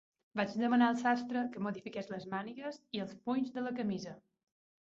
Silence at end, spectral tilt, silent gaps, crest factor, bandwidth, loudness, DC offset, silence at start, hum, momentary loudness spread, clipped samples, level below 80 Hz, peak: 0.75 s; -4.5 dB/octave; none; 20 dB; 7.6 kHz; -36 LUFS; under 0.1%; 0.35 s; none; 13 LU; under 0.1%; -78 dBFS; -16 dBFS